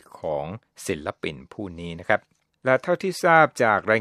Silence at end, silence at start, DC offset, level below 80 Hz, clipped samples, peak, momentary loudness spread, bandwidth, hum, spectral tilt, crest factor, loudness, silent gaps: 0 s; 0.15 s; under 0.1%; -58 dBFS; under 0.1%; -2 dBFS; 17 LU; 15 kHz; none; -5 dB/octave; 22 dB; -23 LUFS; none